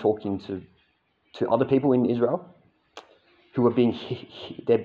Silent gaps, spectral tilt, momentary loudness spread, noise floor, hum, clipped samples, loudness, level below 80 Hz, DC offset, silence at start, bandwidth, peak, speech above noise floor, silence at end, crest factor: none; -9 dB/octave; 14 LU; -68 dBFS; none; under 0.1%; -25 LUFS; -68 dBFS; under 0.1%; 0 s; 7 kHz; -8 dBFS; 44 dB; 0 s; 18 dB